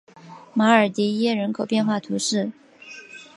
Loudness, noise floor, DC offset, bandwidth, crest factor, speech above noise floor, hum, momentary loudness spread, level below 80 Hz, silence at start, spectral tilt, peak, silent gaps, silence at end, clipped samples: -22 LUFS; -43 dBFS; under 0.1%; 11.5 kHz; 20 dB; 23 dB; none; 22 LU; -72 dBFS; 0.25 s; -4.5 dB/octave; -2 dBFS; none; 0.15 s; under 0.1%